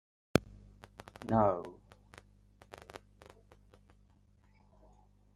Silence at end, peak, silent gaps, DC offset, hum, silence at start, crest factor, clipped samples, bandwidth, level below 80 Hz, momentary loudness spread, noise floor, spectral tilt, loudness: 2.4 s; -8 dBFS; none; under 0.1%; 50 Hz at -65 dBFS; 0.35 s; 30 dB; under 0.1%; 13.5 kHz; -60 dBFS; 28 LU; -66 dBFS; -6.5 dB/octave; -33 LUFS